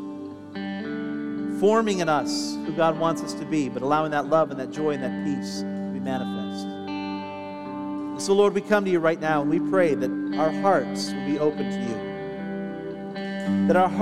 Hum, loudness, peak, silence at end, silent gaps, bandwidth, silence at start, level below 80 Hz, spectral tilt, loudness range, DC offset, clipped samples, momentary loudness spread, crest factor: none; -25 LUFS; -6 dBFS; 0 s; none; 13.5 kHz; 0 s; -62 dBFS; -5.5 dB/octave; 5 LU; 0.1%; under 0.1%; 12 LU; 18 dB